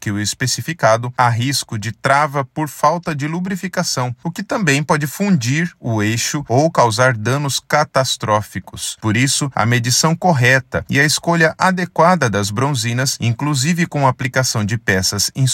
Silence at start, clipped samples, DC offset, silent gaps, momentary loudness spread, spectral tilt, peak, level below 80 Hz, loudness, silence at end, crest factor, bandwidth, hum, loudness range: 0 s; under 0.1%; under 0.1%; none; 7 LU; -4 dB/octave; 0 dBFS; -52 dBFS; -16 LUFS; 0 s; 16 dB; 16.5 kHz; none; 4 LU